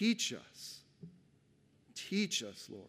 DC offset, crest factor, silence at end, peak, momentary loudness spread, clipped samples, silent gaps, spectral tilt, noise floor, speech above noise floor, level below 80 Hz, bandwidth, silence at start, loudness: under 0.1%; 20 dB; 0 s; -20 dBFS; 23 LU; under 0.1%; none; -3 dB/octave; -70 dBFS; 32 dB; -84 dBFS; 15.5 kHz; 0 s; -38 LUFS